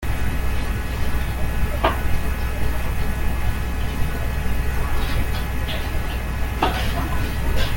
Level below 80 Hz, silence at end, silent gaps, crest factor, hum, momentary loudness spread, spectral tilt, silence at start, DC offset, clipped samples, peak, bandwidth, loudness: -24 dBFS; 0 s; none; 16 dB; none; 4 LU; -5.5 dB/octave; 0 s; under 0.1%; under 0.1%; -4 dBFS; 17 kHz; -25 LUFS